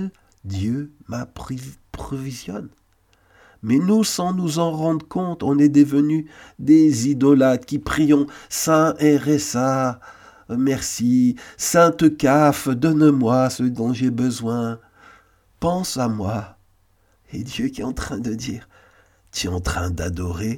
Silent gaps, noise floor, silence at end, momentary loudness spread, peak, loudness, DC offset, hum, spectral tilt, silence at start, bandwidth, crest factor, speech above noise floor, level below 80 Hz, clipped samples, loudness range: none; -60 dBFS; 0 s; 16 LU; -2 dBFS; -19 LUFS; under 0.1%; none; -5.5 dB/octave; 0 s; 17.5 kHz; 18 dB; 41 dB; -44 dBFS; under 0.1%; 11 LU